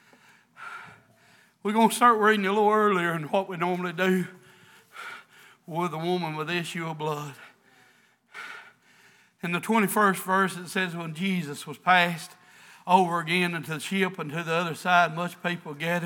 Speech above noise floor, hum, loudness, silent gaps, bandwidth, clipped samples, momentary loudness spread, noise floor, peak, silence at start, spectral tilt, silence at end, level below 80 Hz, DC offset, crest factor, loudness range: 36 dB; none; -25 LUFS; none; 20 kHz; under 0.1%; 20 LU; -62 dBFS; -6 dBFS; 0.6 s; -5 dB/octave; 0 s; -88 dBFS; under 0.1%; 22 dB; 9 LU